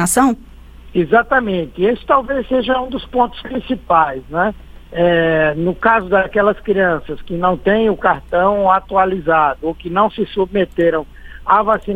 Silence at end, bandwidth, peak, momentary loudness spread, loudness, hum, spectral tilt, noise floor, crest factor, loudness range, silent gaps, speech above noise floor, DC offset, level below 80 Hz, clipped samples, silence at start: 0 s; 17 kHz; 0 dBFS; 9 LU; -16 LUFS; none; -5 dB/octave; -37 dBFS; 16 dB; 2 LU; none; 22 dB; under 0.1%; -38 dBFS; under 0.1%; 0 s